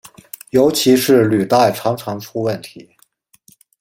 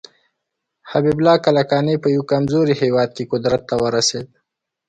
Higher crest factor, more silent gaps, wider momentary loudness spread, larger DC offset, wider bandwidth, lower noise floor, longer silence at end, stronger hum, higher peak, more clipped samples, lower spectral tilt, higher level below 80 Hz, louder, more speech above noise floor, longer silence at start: about the same, 16 dB vs 16 dB; neither; first, 19 LU vs 6 LU; neither; first, 16.5 kHz vs 9.4 kHz; second, -56 dBFS vs -78 dBFS; first, 1 s vs 0.65 s; neither; about the same, -2 dBFS vs -2 dBFS; neither; about the same, -5 dB/octave vs -5 dB/octave; about the same, -56 dBFS vs -54 dBFS; about the same, -15 LUFS vs -17 LUFS; second, 41 dB vs 61 dB; second, 0.55 s vs 0.85 s